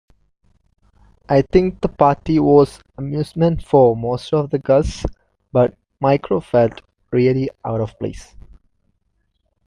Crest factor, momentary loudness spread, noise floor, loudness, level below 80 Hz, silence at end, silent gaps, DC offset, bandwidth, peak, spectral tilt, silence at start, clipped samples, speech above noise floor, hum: 18 dB; 12 LU; -67 dBFS; -18 LUFS; -38 dBFS; 1.45 s; none; under 0.1%; 11 kHz; 0 dBFS; -8 dB/octave; 1.3 s; under 0.1%; 51 dB; none